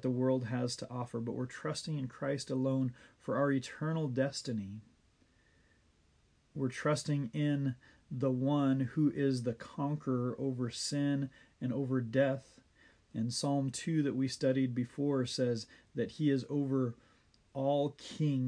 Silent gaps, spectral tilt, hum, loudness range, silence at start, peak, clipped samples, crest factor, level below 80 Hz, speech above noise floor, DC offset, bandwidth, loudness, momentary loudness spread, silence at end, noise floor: none; -6.5 dB/octave; none; 4 LU; 0 s; -18 dBFS; under 0.1%; 18 dB; -72 dBFS; 36 dB; under 0.1%; 10.5 kHz; -35 LUFS; 8 LU; 0 s; -70 dBFS